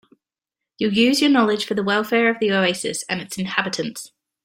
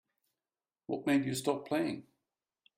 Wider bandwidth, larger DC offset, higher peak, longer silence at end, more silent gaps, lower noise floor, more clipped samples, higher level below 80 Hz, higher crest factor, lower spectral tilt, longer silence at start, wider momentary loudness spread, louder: about the same, 16.5 kHz vs 16 kHz; neither; first, -2 dBFS vs -16 dBFS; second, 0.4 s vs 0.75 s; neither; second, -86 dBFS vs under -90 dBFS; neither; first, -62 dBFS vs -76 dBFS; about the same, 20 dB vs 20 dB; about the same, -4 dB/octave vs -5 dB/octave; about the same, 0.8 s vs 0.9 s; about the same, 11 LU vs 13 LU; first, -20 LUFS vs -34 LUFS